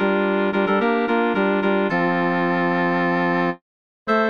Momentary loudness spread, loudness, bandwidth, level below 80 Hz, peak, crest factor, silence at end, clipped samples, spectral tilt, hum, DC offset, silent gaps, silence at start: 3 LU; -20 LUFS; 6.6 kHz; -64 dBFS; -6 dBFS; 14 dB; 0 s; under 0.1%; -8 dB/octave; none; under 0.1%; 3.61-4.06 s; 0 s